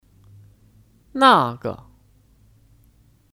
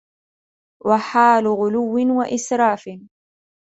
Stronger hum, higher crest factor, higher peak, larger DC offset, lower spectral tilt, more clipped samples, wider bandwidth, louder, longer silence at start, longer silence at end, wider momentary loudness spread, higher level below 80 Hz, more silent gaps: neither; about the same, 22 dB vs 18 dB; about the same, -2 dBFS vs -2 dBFS; neither; about the same, -5 dB/octave vs -5 dB/octave; neither; first, 16 kHz vs 8.2 kHz; about the same, -18 LUFS vs -18 LUFS; first, 1.15 s vs 0.85 s; first, 1.65 s vs 0.55 s; first, 21 LU vs 11 LU; first, -58 dBFS vs -64 dBFS; neither